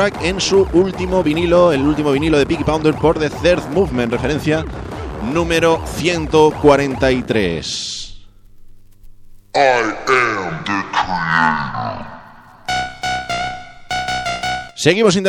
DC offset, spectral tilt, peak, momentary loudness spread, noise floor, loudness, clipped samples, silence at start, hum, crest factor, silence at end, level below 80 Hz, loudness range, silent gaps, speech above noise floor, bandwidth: under 0.1%; -5 dB/octave; 0 dBFS; 12 LU; -40 dBFS; -16 LUFS; under 0.1%; 0 s; none; 16 dB; 0 s; -34 dBFS; 5 LU; none; 25 dB; 14.5 kHz